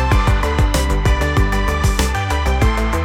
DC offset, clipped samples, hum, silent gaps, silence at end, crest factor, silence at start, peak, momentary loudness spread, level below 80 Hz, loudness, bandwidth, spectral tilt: under 0.1%; under 0.1%; none; none; 0 s; 14 dB; 0 s; -2 dBFS; 2 LU; -18 dBFS; -17 LUFS; 16.5 kHz; -5 dB/octave